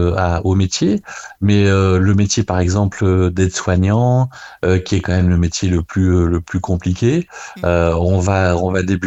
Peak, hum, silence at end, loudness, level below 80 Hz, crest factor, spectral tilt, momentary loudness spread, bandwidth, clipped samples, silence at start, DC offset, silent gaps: 0 dBFS; none; 0 s; -16 LUFS; -32 dBFS; 14 dB; -6 dB/octave; 7 LU; 8.2 kHz; under 0.1%; 0 s; under 0.1%; none